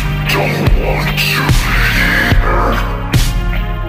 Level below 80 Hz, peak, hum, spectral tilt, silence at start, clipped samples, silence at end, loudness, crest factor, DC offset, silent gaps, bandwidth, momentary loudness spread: -16 dBFS; -2 dBFS; none; -5 dB/octave; 0 s; under 0.1%; 0 s; -13 LUFS; 12 dB; under 0.1%; none; 15.5 kHz; 6 LU